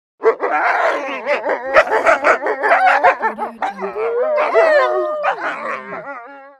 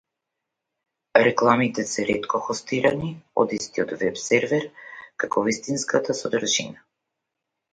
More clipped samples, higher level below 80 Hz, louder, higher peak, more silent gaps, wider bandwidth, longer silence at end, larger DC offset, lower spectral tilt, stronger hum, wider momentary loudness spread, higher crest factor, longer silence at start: neither; about the same, -58 dBFS vs -62 dBFS; first, -16 LUFS vs -23 LUFS; about the same, 0 dBFS vs 0 dBFS; neither; first, 12 kHz vs 9.6 kHz; second, 0.1 s vs 1 s; neither; about the same, -3.5 dB/octave vs -3.5 dB/octave; neither; first, 12 LU vs 9 LU; second, 16 dB vs 24 dB; second, 0.2 s vs 1.15 s